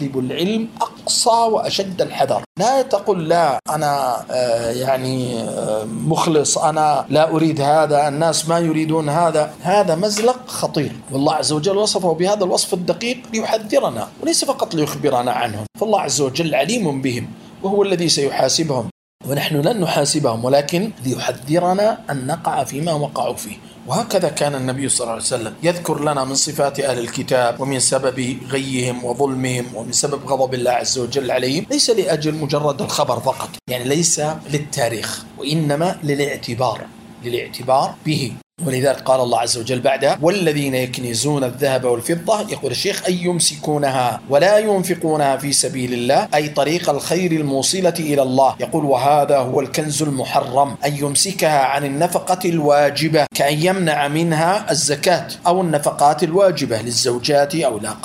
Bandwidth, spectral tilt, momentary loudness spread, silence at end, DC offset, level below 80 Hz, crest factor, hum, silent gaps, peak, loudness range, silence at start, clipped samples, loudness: 16 kHz; -4 dB/octave; 7 LU; 0 s; under 0.1%; -56 dBFS; 18 dB; none; 2.46-2.55 s, 18.91-19.19 s, 38.43-38.50 s; 0 dBFS; 3 LU; 0 s; under 0.1%; -18 LUFS